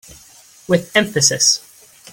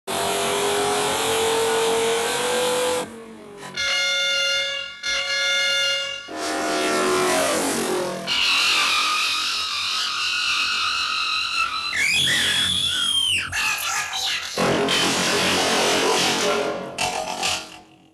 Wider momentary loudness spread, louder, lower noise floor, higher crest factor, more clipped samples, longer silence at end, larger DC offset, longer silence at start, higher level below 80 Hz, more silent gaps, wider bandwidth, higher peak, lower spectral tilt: about the same, 7 LU vs 7 LU; first, -15 LUFS vs -20 LUFS; about the same, -46 dBFS vs -44 dBFS; about the same, 20 dB vs 16 dB; neither; first, 0.55 s vs 0.3 s; neither; about the same, 0.1 s vs 0.05 s; about the same, -56 dBFS vs -58 dBFS; neither; about the same, 17 kHz vs 16 kHz; first, 0 dBFS vs -8 dBFS; about the same, -2 dB/octave vs -1.5 dB/octave